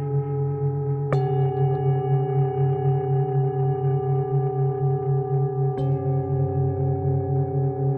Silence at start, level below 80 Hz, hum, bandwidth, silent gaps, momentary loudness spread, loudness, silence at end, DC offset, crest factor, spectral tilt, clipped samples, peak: 0 s; -46 dBFS; none; 3.1 kHz; none; 3 LU; -23 LUFS; 0 s; under 0.1%; 12 dB; -12 dB/octave; under 0.1%; -10 dBFS